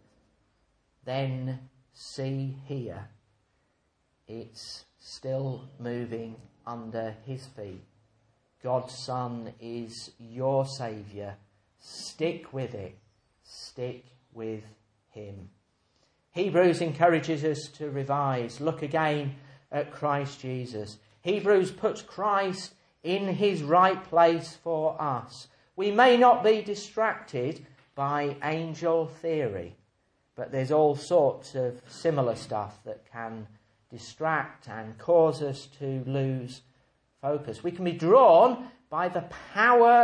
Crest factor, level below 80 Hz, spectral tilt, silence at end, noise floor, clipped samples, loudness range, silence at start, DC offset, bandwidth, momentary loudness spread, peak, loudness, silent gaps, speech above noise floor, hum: 22 dB; -70 dBFS; -6 dB/octave; 0 s; -73 dBFS; under 0.1%; 14 LU; 1.05 s; under 0.1%; 10.5 kHz; 21 LU; -6 dBFS; -27 LUFS; none; 46 dB; none